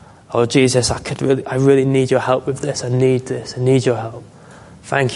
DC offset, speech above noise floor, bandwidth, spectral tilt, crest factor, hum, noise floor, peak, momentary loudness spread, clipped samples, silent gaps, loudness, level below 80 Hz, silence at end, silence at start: under 0.1%; 24 dB; 11.5 kHz; -5.5 dB/octave; 16 dB; none; -41 dBFS; 0 dBFS; 9 LU; under 0.1%; none; -17 LUFS; -44 dBFS; 0 s; 0.3 s